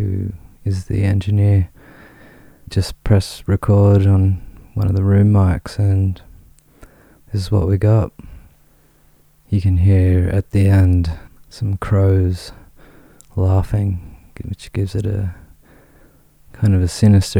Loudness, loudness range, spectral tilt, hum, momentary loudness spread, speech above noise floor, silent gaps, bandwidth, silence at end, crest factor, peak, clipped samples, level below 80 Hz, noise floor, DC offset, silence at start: -17 LUFS; 7 LU; -8 dB/octave; none; 14 LU; 37 dB; none; 11 kHz; 0 s; 16 dB; 0 dBFS; under 0.1%; -34 dBFS; -52 dBFS; under 0.1%; 0 s